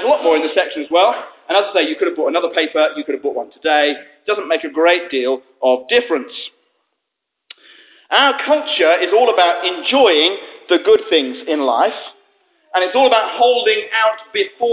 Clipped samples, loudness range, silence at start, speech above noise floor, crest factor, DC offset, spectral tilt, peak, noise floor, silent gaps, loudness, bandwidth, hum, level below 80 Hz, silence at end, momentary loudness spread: under 0.1%; 5 LU; 0 s; 62 dB; 16 dB; under 0.1%; -5.5 dB/octave; 0 dBFS; -77 dBFS; none; -15 LUFS; 4 kHz; none; -68 dBFS; 0 s; 9 LU